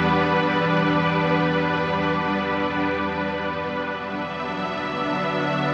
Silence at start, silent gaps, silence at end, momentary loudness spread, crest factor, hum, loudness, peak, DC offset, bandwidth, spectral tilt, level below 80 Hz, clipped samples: 0 s; none; 0 s; 7 LU; 16 dB; 50 Hz at -55 dBFS; -23 LUFS; -8 dBFS; under 0.1%; 7.6 kHz; -7 dB/octave; -50 dBFS; under 0.1%